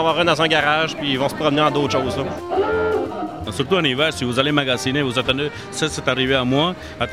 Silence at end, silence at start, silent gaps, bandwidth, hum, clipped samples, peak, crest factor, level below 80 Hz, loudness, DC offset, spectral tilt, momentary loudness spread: 0 s; 0 s; none; 15.5 kHz; none; under 0.1%; -2 dBFS; 18 dB; -46 dBFS; -19 LUFS; 0.2%; -4.5 dB/octave; 8 LU